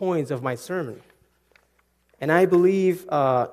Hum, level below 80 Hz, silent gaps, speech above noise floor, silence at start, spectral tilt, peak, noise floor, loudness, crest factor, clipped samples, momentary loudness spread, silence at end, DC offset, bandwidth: none; -68 dBFS; none; 44 dB; 0 s; -7 dB/octave; -4 dBFS; -66 dBFS; -22 LUFS; 20 dB; under 0.1%; 12 LU; 0 s; under 0.1%; 14.5 kHz